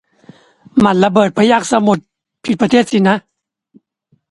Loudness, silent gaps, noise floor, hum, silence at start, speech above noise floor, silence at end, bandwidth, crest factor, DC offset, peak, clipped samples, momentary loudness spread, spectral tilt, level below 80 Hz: -13 LUFS; none; -60 dBFS; none; 0.75 s; 48 dB; 1.1 s; 11.5 kHz; 14 dB; under 0.1%; 0 dBFS; under 0.1%; 8 LU; -5.5 dB/octave; -52 dBFS